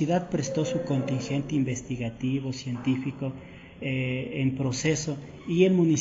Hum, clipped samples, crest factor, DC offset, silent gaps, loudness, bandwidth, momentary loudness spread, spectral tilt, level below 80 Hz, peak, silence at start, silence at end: none; under 0.1%; 18 dB; under 0.1%; none; -28 LUFS; 8 kHz; 11 LU; -6.5 dB/octave; -56 dBFS; -8 dBFS; 0 s; 0 s